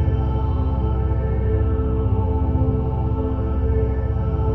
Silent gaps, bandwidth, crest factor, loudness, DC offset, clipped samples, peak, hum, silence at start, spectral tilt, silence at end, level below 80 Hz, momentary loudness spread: none; 3.3 kHz; 10 dB; -22 LUFS; under 0.1%; under 0.1%; -8 dBFS; none; 0 s; -11.5 dB/octave; 0 s; -24 dBFS; 2 LU